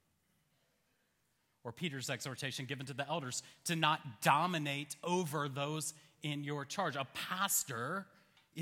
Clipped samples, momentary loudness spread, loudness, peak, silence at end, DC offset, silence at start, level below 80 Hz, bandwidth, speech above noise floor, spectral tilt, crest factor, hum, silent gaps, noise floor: under 0.1%; 10 LU; -37 LUFS; -14 dBFS; 0 s; under 0.1%; 1.65 s; -84 dBFS; 17 kHz; 41 dB; -3.5 dB/octave; 26 dB; none; none; -79 dBFS